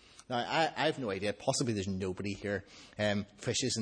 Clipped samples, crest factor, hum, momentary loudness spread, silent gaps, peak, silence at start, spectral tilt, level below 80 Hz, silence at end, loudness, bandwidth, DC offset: under 0.1%; 20 dB; none; 7 LU; none; -16 dBFS; 0.2 s; -4 dB/octave; -66 dBFS; 0 s; -34 LUFS; 10.5 kHz; under 0.1%